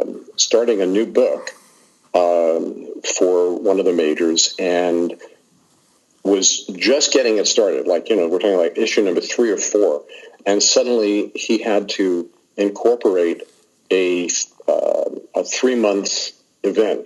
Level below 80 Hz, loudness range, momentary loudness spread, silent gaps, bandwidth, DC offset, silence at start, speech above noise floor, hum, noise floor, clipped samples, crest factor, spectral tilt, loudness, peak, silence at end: -76 dBFS; 3 LU; 9 LU; none; 12 kHz; under 0.1%; 0 s; 41 dB; none; -58 dBFS; under 0.1%; 16 dB; -2 dB/octave; -18 LUFS; -2 dBFS; 0 s